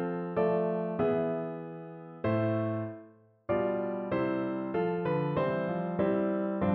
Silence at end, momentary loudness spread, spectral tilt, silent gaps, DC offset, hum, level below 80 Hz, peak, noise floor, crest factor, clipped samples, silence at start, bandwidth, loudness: 0 s; 12 LU; -7.5 dB/octave; none; under 0.1%; none; -62 dBFS; -16 dBFS; -56 dBFS; 14 dB; under 0.1%; 0 s; 4.5 kHz; -31 LUFS